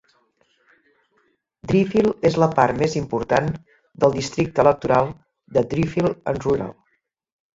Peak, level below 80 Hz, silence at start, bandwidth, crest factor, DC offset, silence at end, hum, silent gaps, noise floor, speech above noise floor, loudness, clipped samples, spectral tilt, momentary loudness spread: -2 dBFS; -48 dBFS; 1.65 s; 7.8 kHz; 20 dB; under 0.1%; 0.85 s; none; none; -70 dBFS; 51 dB; -20 LUFS; under 0.1%; -6.5 dB/octave; 7 LU